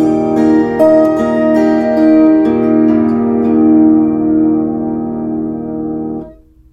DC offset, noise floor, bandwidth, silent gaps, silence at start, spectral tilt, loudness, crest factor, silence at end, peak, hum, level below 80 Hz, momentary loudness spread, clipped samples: under 0.1%; -35 dBFS; 7 kHz; none; 0 s; -8.5 dB/octave; -11 LUFS; 10 dB; 0.4 s; 0 dBFS; none; -42 dBFS; 11 LU; under 0.1%